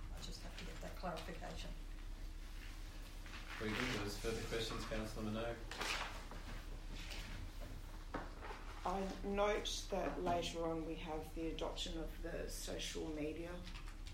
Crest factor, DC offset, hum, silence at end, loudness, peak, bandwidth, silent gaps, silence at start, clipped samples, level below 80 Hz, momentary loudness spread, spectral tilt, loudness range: 20 dB; under 0.1%; none; 0 s; -45 LUFS; -24 dBFS; 16 kHz; none; 0 s; under 0.1%; -50 dBFS; 13 LU; -4 dB/octave; 7 LU